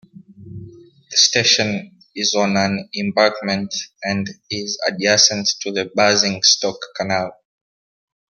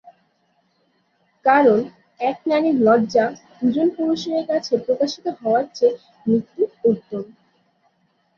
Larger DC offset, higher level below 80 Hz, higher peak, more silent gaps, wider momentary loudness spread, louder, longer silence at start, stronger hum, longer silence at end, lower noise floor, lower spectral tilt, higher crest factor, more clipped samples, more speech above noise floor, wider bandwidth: neither; about the same, -62 dBFS vs -66 dBFS; about the same, 0 dBFS vs -2 dBFS; neither; first, 14 LU vs 10 LU; first, -17 LUFS vs -20 LUFS; second, 0.15 s vs 1.45 s; neither; second, 0.95 s vs 1.1 s; second, -41 dBFS vs -65 dBFS; second, -2 dB/octave vs -6 dB/octave; about the same, 20 dB vs 18 dB; neither; second, 23 dB vs 46 dB; first, 11 kHz vs 7 kHz